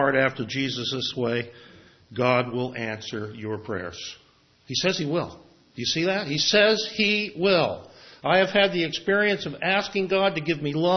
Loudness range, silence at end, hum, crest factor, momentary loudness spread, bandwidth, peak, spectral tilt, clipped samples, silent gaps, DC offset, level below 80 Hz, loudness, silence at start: 7 LU; 0 s; none; 18 dB; 13 LU; 6.4 kHz; -6 dBFS; -4 dB/octave; under 0.1%; none; under 0.1%; -64 dBFS; -24 LUFS; 0 s